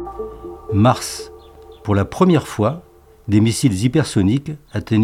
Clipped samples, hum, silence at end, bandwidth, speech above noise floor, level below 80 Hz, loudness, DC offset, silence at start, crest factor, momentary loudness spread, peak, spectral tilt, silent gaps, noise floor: under 0.1%; none; 0 s; 15.5 kHz; 24 dB; -44 dBFS; -18 LUFS; under 0.1%; 0 s; 16 dB; 16 LU; -2 dBFS; -6.5 dB/octave; none; -41 dBFS